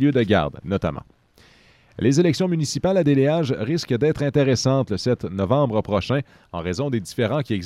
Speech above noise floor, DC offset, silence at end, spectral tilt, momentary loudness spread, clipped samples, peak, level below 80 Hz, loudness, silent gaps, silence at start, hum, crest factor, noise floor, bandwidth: 33 dB; under 0.1%; 0 s; -6.5 dB/octave; 7 LU; under 0.1%; -6 dBFS; -48 dBFS; -21 LUFS; none; 0 s; none; 16 dB; -54 dBFS; 13 kHz